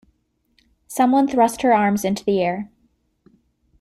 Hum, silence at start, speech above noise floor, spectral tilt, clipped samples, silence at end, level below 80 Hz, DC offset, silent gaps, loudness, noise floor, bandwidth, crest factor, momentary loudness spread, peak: none; 0.9 s; 47 dB; -5.5 dB/octave; under 0.1%; 1.15 s; -58 dBFS; under 0.1%; none; -19 LUFS; -65 dBFS; 14.5 kHz; 16 dB; 14 LU; -4 dBFS